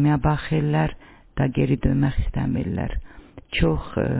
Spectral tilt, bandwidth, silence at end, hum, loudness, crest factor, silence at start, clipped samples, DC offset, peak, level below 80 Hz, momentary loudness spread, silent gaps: -11.5 dB/octave; 4 kHz; 0 s; none; -23 LUFS; 18 dB; 0 s; under 0.1%; under 0.1%; -4 dBFS; -32 dBFS; 8 LU; none